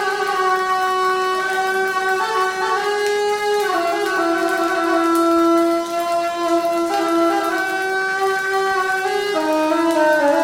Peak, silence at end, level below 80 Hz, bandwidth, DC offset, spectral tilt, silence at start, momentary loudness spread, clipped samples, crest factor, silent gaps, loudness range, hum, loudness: -6 dBFS; 0 s; -60 dBFS; 17 kHz; under 0.1%; -2.5 dB/octave; 0 s; 4 LU; under 0.1%; 12 dB; none; 1 LU; none; -18 LUFS